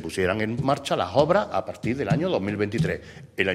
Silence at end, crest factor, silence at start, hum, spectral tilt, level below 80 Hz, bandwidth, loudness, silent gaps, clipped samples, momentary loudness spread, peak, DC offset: 0 s; 22 dB; 0 s; none; -6 dB/octave; -50 dBFS; 14 kHz; -25 LUFS; none; under 0.1%; 8 LU; -4 dBFS; under 0.1%